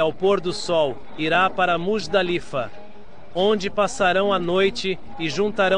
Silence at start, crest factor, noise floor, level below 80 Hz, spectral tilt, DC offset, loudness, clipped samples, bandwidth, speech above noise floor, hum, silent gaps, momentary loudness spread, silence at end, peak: 0 s; 16 dB; -46 dBFS; -50 dBFS; -4.5 dB/octave; 2%; -22 LUFS; under 0.1%; 10.5 kHz; 24 dB; none; none; 8 LU; 0 s; -6 dBFS